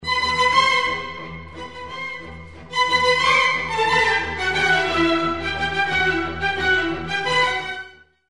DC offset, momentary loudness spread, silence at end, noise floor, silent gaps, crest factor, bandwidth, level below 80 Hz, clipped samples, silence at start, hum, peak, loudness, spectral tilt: 0.5%; 17 LU; 0 s; -41 dBFS; none; 16 dB; 11.5 kHz; -44 dBFS; under 0.1%; 0 s; none; -4 dBFS; -19 LUFS; -3 dB/octave